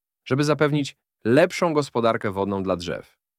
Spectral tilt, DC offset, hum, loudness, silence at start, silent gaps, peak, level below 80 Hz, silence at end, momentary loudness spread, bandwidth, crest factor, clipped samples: -6 dB/octave; under 0.1%; none; -23 LUFS; 0.25 s; none; -4 dBFS; -60 dBFS; 0.35 s; 12 LU; 15.5 kHz; 20 dB; under 0.1%